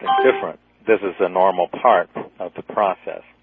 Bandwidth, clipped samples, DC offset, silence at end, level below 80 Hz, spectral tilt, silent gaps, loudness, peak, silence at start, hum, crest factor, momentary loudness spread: 4.1 kHz; under 0.1%; under 0.1%; 0.25 s; -66 dBFS; -8.5 dB/octave; none; -19 LUFS; 0 dBFS; 0 s; none; 18 dB; 14 LU